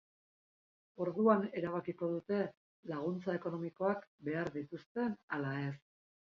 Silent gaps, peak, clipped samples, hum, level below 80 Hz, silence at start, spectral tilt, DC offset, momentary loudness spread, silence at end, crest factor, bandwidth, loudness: 2.57-2.83 s, 4.07-4.18 s, 4.86-4.95 s, 5.23-5.28 s; -16 dBFS; under 0.1%; none; -78 dBFS; 1 s; -7 dB/octave; under 0.1%; 12 LU; 0.6 s; 22 dB; 6.8 kHz; -38 LUFS